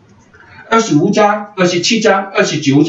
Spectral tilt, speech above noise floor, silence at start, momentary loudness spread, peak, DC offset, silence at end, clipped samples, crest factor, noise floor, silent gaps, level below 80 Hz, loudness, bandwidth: -4.5 dB/octave; 32 dB; 0.6 s; 4 LU; 0 dBFS; under 0.1%; 0 s; under 0.1%; 12 dB; -43 dBFS; none; -56 dBFS; -12 LUFS; 8 kHz